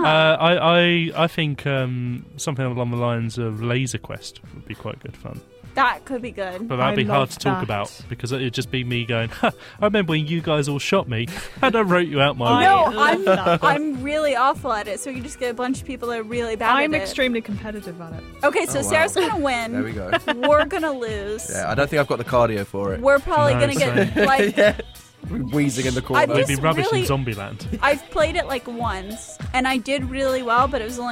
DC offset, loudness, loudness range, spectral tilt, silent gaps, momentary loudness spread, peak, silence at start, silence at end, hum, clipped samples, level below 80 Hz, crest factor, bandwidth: under 0.1%; -21 LUFS; 6 LU; -5 dB/octave; none; 13 LU; -4 dBFS; 0 s; 0 s; none; under 0.1%; -44 dBFS; 16 dB; 16.5 kHz